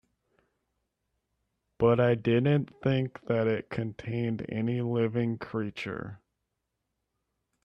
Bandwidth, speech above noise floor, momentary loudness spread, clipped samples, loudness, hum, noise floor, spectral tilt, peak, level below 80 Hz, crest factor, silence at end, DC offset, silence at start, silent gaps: 6.6 kHz; 55 dB; 11 LU; under 0.1%; -29 LUFS; none; -83 dBFS; -9 dB/octave; -10 dBFS; -62 dBFS; 20 dB; 1.45 s; under 0.1%; 1.8 s; none